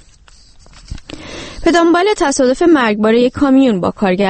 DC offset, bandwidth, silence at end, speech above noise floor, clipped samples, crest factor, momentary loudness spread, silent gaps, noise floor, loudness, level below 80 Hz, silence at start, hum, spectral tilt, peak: under 0.1%; 8.8 kHz; 0 s; 32 dB; under 0.1%; 14 dB; 19 LU; none; -43 dBFS; -12 LUFS; -36 dBFS; 0.9 s; none; -5 dB/octave; 0 dBFS